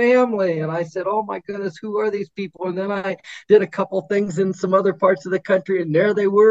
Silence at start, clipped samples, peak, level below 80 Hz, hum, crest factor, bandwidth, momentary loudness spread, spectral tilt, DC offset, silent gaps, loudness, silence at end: 0 s; under 0.1%; -2 dBFS; -68 dBFS; none; 16 dB; 7.8 kHz; 11 LU; -7 dB/octave; under 0.1%; none; -20 LUFS; 0 s